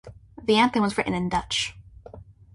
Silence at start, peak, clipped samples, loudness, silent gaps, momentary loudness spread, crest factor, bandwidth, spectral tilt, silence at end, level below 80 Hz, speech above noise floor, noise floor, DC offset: 0.05 s; -8 dBFS; under 0.1%; -24 LUFS; none; 9 LU; 18 dB; 11.5 kHz; -4.5 dB/octave; 0.3 s; -48 dBFS; 23 dB; -46 dBFS; under 0.1%